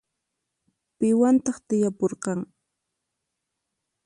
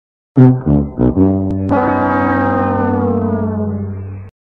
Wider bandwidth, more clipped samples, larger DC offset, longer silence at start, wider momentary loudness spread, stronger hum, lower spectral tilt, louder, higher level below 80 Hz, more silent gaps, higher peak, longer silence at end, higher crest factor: first, 11 kHz vs 4.5 kHz; neither; second, under 0.1% vs 0.3%; first, 1 s vs 0.35 s; about the same, 11 LU vs 12 LU; neither; second, -7 dB/octave vs -11.5 dB/octave; second, -24 LUFS vs -14 LUFS; second, -70 dBFS vs -34 dBFS; neither; second, -10 dBFS vs 0 dBFS; first, 1.6 s vs 0.25 s; about the same, 16 dB vs 14 dB